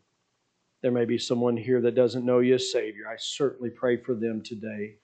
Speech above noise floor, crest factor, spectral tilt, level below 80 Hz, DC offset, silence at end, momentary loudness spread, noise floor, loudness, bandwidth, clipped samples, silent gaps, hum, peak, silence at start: 49 dB; 18 dB; -5.5 dB/octave; -76 dBFS; under 0.1%; 0.15 s; 12 LU; -75 dBFS; -27 LUFS; 9 kHz; under 0.1%; none; none; -8 dBFS; 0.85 s